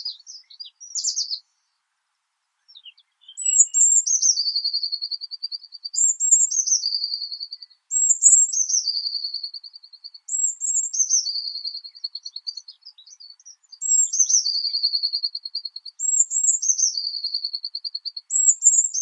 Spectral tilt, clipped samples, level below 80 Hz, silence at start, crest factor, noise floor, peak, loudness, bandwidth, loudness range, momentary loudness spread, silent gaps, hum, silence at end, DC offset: 12.5 dB/octave; under 0.1%; under -90 dBFS; 0 s; 24 dB; -76 dBFS; 0 dBFS; -19 LUFS; 9.6 kHz; 6 LU; 18 LU; none; none; 0 s; under 0.1%